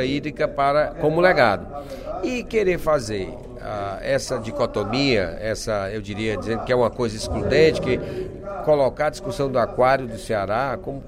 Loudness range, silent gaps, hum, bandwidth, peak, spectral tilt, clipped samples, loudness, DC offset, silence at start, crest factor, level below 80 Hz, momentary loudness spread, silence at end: 3 LU; none; none; 15.5 kHz; -4 dBFS; -5.5 dB/octave; under 0.1%; -22 LUFS; under 0.1%; 0 s; 18 dB; -40 dBFS; 11 LU; 0 s